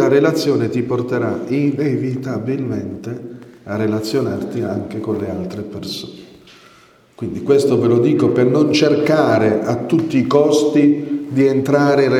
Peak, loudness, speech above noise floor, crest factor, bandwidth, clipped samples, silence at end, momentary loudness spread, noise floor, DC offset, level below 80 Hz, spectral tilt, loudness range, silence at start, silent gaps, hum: 0 dBFS; -17 LUFS; 33 dB; 16 dB; 15 kHz; under 0.1%; 0 s; 13 LU; -49 dBFS; under 0.1%; -56 dBFS; -6.5 dB/octave; 8 LU; 0 s; none; none